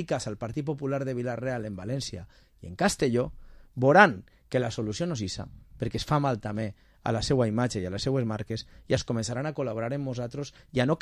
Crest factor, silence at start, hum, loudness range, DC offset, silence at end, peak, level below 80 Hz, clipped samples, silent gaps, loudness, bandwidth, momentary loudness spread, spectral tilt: 24 dB; 0 s; none; 5 LU; under 0.1%; 0.05 s; -4 dBFS; -50 dBFS; under 0.1%; none; -28 LUFS; 13.5 kHz; 12 LU; -5.5 dB/octave